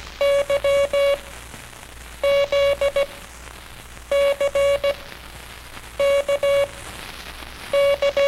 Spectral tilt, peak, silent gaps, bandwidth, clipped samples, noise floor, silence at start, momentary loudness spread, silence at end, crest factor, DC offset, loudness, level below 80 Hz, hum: -2.5 dB/octave; -10 dBFS; none; 15.5 kHz; under 0.1%; -39 dBFS; 0 s; 20 LU; 0 s; 12 dB; under 0.1%; -20 LUFS; -44 dBFS; none